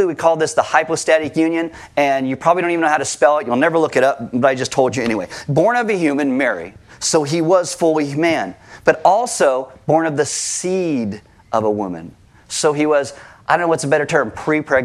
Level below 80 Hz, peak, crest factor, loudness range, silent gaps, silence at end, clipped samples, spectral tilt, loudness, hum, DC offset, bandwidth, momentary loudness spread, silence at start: -56 dBFS; 0 dBFS; 16 dB; 3 LU; none; 0 s; under 0.1%; -4.5 dB/octave; -17 LUFS; none; under 0.1%; 14 kHz; 8 LU; 0 s